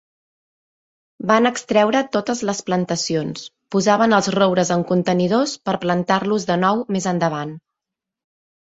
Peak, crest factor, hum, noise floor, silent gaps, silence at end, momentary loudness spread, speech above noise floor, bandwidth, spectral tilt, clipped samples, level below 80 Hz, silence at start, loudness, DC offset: -2 dBFS; 18 dB; none; -85 dBFS; none; 1.15 s; 7 LU; 66 dB; 8 kHz; -5 dB/octave; under 0.1%; -60 dBFS; 1.2 s; -19 LUFS; under 0.1%